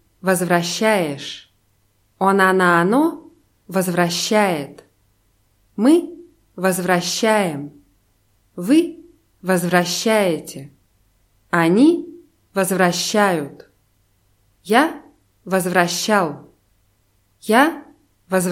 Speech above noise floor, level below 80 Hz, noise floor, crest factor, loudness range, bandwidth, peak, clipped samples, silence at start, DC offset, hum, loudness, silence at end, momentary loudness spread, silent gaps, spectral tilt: 45 dB; -64 dBFS; -62 dBFS; 20 dB; 3 LU; 16.5 kHz; 0 dBFS; under 0.1%; 0.25 s; under 0.1%; none; -18 LUFS; 0 s; 19 LU; none; -4.5 dB/octave